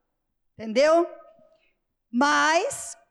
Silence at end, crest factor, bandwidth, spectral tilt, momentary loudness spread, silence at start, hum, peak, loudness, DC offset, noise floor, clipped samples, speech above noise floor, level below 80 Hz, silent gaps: 0.2 s; 14 dB; 13 kHz; -2.5 dB/octave; 13 LU; 0.6 s; none; -12 dBFS; -22 LUFS; under 0.1%; -76 dBFS; under 0.1%; 54 dB; -70 dBFS; none